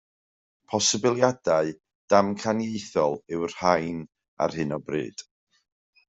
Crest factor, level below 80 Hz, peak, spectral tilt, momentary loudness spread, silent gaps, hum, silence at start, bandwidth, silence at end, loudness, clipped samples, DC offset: 22 dB; -64 dBFS; -4 dBFS; -4 dB/octave; 10 LU; 1.95-2.08 s, 4.28-4.37 s; none; 0.7 s; 8.2 kHz; 0.85 s; -25 LUFS; under 0.1%; under 0.1%